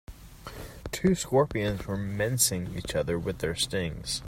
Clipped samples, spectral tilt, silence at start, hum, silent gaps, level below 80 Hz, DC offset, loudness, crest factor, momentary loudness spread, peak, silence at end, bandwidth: under 0.1%; -4 dB/octave; 0.1 s; none; none; -46 dBFS; under 0.1%; -28 LUFS; 20 dB; 18 LU; -10 dBFS; 0 s; 16 kHz